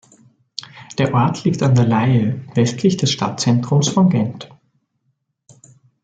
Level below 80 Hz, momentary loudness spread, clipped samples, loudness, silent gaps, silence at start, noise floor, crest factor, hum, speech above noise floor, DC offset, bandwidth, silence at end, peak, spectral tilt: -56 dBFS; 17 LU; under 0.1%; -17 LUFS; none; 0.75 s; -69 dBFS; 14 dB; none; 53 dB; under 0.1%; 9 kHz; 1.55 s; -4 dBFS; -6 dB/octave